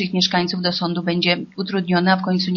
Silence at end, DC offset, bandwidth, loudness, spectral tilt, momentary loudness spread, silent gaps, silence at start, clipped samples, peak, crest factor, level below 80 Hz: 0 s; under 0.1%; 6.8 kHz; -19 LUFS; -3.5 dB/octave; 5 LU; none; 0 s; under 0.1%; -4 dBFS; 16 dB; -58 dBFS